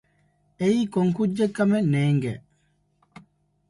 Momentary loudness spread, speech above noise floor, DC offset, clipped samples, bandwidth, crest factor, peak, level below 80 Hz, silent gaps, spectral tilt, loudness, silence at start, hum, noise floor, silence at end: 5 LU; 45 dB; under 0.1%; under 0.1%; 11.5 kHz; 16 dB; -8 dBFS; -62 dBFS; none; -7.5 dB/octave; -23 LUFS; 0.6 s; 50 Hz at -40 dBFS; -67 dBFS; 1.3 s